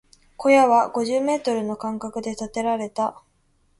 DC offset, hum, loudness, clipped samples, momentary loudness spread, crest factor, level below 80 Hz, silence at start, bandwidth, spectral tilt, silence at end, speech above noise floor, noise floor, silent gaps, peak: under 0.1%; none; -22 LUFS; under 0.1%; 13 LU; 18 dB; -60 dBFS; 0.4 s; 11.5 kHz; -4.5 dB/octave; 0.7 s; 42 dB; -63 dBFS; none; -4 dBFS